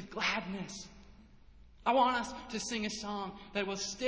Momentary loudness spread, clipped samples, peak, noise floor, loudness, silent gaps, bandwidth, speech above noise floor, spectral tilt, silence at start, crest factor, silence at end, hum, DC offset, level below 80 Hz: 13 LU; under 0.1%; -18 dBFS; -57 dBFS; -35 LUFS; none; 8 kHz; 23 dB; -3 dB/octave; 0 s; 18 dB; 0 s; none; under 0.1%; -60 dBFS